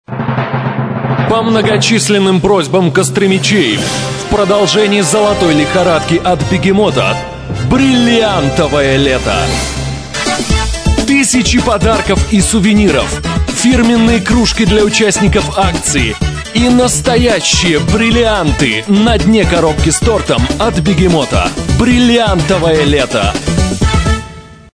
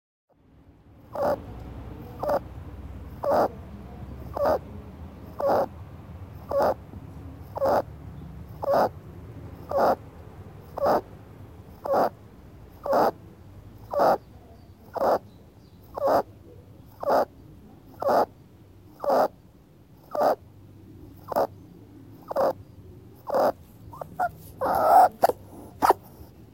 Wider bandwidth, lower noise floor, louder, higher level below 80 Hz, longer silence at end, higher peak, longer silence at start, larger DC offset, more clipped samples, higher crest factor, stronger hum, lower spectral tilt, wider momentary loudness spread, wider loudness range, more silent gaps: second, 11 kHz vs 17 kHz; second, -30 dBFS vs -55 dBFS; first, -10 LUFS vs -26 LUFS; first, -22 dBFS vs -50 dBFS; about the same, 0.2 s vs 0.3 s; first, 0 dBFS vs -4 dBFS; second, 0.1 s vs 1.1 s; neither; neither; second, 10 dB vs 24 dB; neither; second, -4.5 dB/octave vs -6 dB/octave; second, 6 LU vs 22 LU; second, 2 LU vs 6 LU; neither